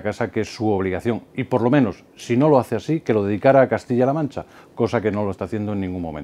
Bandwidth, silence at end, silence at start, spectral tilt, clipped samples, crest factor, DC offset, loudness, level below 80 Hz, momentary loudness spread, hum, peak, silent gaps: 13.5 kHz; 0 s; 0 s; -7.5 dB/octave; under 0.1%; 20 dB; under 0.1%; -21 LUFS; -54 dBFS; 10 LU; none; 0 dBFS; none